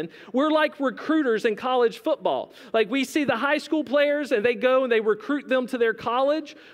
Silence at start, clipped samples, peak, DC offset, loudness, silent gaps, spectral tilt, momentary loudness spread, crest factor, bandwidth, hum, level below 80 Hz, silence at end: 0 s; under 0.1%; -8 dBFS; under 0.1%; -23 LUFS; none; -4.5 dB/octave; 5 LU; 14 dB; 16 kHz; none; -74 dBFS; 0.15 s